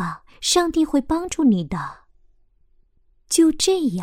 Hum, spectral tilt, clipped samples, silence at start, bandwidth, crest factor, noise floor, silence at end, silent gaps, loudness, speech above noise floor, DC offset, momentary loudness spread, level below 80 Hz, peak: none; -4 dB/octave; under 0.1%; 0 s; 16 kHz; 16 dB; -58 dBFS; 0 s; none; -20 LUFS; 39 dB; under 0.1%; 12 LU; -46 dBFS; -4 dBFS